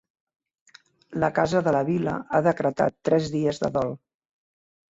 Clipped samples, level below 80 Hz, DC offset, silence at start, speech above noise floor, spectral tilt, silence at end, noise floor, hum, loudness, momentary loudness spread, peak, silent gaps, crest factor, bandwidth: under 0.1%; -58 dBFS; under 0.1%; 1.1 s; 25 dB; -7 dB/octave; 1 s; -49 dBFS; none; -24 LUFS; 6 LU; -8 dBFS; none; 18 dB; 8 kHz